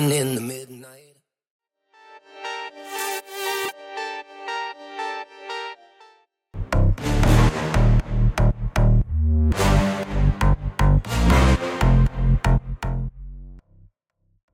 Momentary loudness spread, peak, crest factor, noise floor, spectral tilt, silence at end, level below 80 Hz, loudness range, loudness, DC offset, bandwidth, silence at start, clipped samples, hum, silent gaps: 14 LU; -2 dBFS; 18 dB; -68 dBFS; -6 dB/octave; 0.95 s; -24 dBFS; 11 LU; -22 LUFS; under 0.1%; 16.5 kHz; 0 s; under 0.1%; none; 1.50-1.59 s